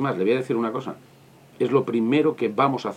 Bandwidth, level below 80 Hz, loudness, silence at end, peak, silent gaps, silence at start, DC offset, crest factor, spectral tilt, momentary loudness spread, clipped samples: 12.5 kHz; -76 dBFS; -23 LUFS; 0 s; -6 dBFS; none; 0 s; under 0.1%; 18 dB; -7.5 dB/octave; 10 LU; under 0.1%